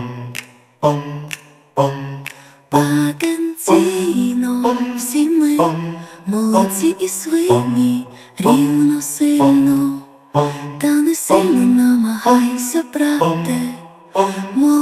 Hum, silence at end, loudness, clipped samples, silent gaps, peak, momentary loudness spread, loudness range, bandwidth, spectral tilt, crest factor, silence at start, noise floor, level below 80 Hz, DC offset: none; 0 s; -16 LUFS; under 0.1%; none; 0 dBFS; 14 LU; 3 LU; 15.5 kHz; -5.5 dB/octave; 16 dB; 0 s; -36 dBFS; -58 dBFS; under 0.1%